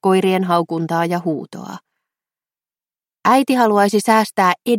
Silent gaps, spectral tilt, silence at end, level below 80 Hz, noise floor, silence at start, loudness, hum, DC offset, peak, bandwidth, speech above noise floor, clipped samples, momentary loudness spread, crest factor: none; -5.5 dB/octave; 0 s; -68 dBFS; under -90 dBFS; 0.05 s; -16 LUFS; none; under 0.1%; -2 dBFS; 16.5 kHz; over 74 dB; under 0.1%; 12 LU; 16 dB